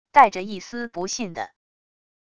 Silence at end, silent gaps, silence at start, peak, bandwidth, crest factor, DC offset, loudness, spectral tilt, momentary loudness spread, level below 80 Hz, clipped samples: 0.8 s; none; 0.15 s; -2 dBFS; 10 kHz; 22 dB; under 0.1%; -23 LUFS; -3 dB/octave; 17 LU; -62 dBFS; under 0.1%